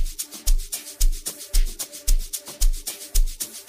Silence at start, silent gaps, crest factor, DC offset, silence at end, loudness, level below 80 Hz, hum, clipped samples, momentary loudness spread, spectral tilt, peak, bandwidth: 0 s; none; 14 dB; under 0.1%; 0.05 s; -28 LUFS; -22 dBFS; none; under 0.1%; 5 LU; -2 dB/octave; -6 dBFS; 16 kHz